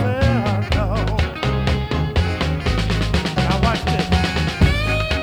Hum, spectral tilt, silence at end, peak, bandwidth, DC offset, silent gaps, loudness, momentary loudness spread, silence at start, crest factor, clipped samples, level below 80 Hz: none; -6 dB/octave; 0 s; -2 dBFS; 14 kHz; under 0.1%; none; -19 LUFS; 3 LU; 0 s; 16 dB; under 0.1%; -24 dBFS